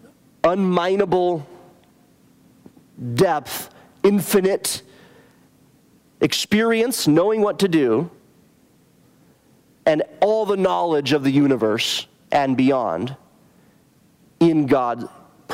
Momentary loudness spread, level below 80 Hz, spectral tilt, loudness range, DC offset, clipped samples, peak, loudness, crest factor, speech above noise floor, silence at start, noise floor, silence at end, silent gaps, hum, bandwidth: 10 LU; -60 dBFS; -5 dB/octave; 3 LU; under 0.1%; under 0.1%; -4 dBFS; -20 LUFS; 18 dB; 37 dB; 0.45 s; -56 dBFS; 0 s; none; none; 16 kHz